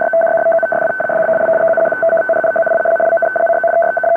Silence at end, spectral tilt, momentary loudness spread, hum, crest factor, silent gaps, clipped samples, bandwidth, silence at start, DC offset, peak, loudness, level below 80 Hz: 0 s; -7.5 dB/octave; 2 LU; none; 8 dB; none; under 0.1%; 3.1 kHz; 0 s; under 0.1%; -6 dBFS; -13 LUFS; -60 dBFS